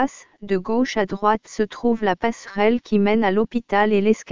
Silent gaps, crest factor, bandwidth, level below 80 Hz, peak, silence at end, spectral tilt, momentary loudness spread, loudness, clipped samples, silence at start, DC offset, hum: none; 16 dB; 7.6 kHz; -52 dBFS; -4 dBFS; 0 s; -6 dB/octave; 8 LU; -21 LUFS; under 0.1%; 0 s; 1%; none